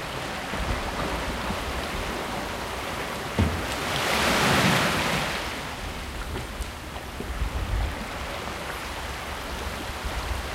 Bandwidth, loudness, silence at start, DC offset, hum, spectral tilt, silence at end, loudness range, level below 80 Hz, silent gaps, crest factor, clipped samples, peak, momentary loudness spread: 16 kHz; -28 LUFS; 0 s; under 0.1%; none; -4 dB/octave; 0 s; 8 LU; -36 dBFS; none; 20 dB; under 0.1%; -8 dBFS; 12 LU